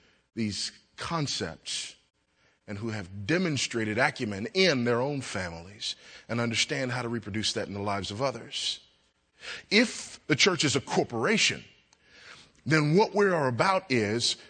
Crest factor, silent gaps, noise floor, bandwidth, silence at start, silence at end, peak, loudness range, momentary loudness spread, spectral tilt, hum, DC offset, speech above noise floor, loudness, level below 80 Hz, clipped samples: 22 dB; none; -69 dBFS; 9.4 kHz; 0.35 s; 0 s; -8 dBFS; 5 LU; 14 LU; -4 dB/octave; none; under 0.1%; 40 dB; -28 LUFS; -64 dBFS; under 0.1%